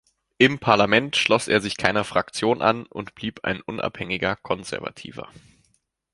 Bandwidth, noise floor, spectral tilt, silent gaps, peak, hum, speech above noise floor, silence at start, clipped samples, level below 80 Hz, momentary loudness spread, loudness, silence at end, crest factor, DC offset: 11.5 kHz; -68 dBFS; -4.5 dB/octave; none; -2 dBFS; none; 45 dB; 0.4 s; under 0.1%; -54 dBFS; 14 LU; -22 LUFS; 0.9 s; 22 dB; under 0.1%